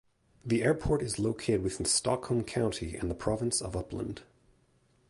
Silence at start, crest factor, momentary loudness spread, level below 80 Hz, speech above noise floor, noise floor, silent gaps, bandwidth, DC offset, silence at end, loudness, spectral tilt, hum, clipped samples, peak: 0.45 s; 18 dB; 10 LU; -48 dBFS; 37 dB; -68 dBFS; none; 11.5 kHz; under 0.1%; 0.85 s; -31 LUFS; -4.5 dB/octave; none; under 0.1%; -14 dBFS